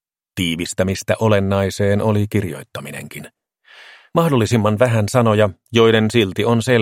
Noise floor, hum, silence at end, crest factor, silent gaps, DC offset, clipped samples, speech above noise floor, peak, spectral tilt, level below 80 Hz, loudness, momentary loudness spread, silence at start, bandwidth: -47 dBFS; none; 0 s; 18 dB; none; under 0.1%; under 0.1%; 30 dB; 0 dBFS; -6 dB/octave; -52 dBFS; -17 LUFS; 16 LU; 0.35 s; 16 kHz